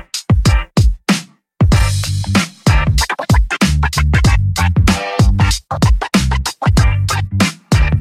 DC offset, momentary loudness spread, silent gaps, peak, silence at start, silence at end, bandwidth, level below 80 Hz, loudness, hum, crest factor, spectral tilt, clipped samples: under 0.1%; 4 LU; none; 0 dBFS; 0.15 s; 0 s; 15.5 kHz; -18 dBFS; -14 LUFS; none; 12 dB; -5 dB/octave; under 0.1%